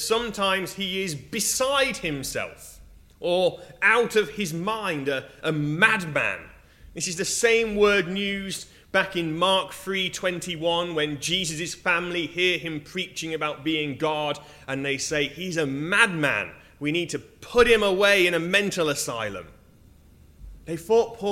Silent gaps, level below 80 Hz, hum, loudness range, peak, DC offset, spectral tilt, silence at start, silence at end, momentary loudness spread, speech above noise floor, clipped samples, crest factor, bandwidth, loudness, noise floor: none; -52 dBFS; none; 4 LU; 0 dBFS; under 0.1%; -3 dB/octave; 0 s; 0 s; 12 LU; 28 dB; under 0.1%; 24 dB; 16 kHz; -24 LUFS; -53 dBFS